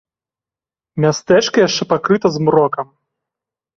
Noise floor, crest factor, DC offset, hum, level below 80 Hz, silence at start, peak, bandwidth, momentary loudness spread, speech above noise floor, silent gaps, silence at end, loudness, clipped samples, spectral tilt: under -90 dBFS; 16 dB; under 0.1%; none; -56 dBFS; 0.95 s; -2 dBFS; 7.6 kHz; 11 LU; over 76 dB; none; 0.95 s; -15 LUFS; under 0.1%; -5 dB/octave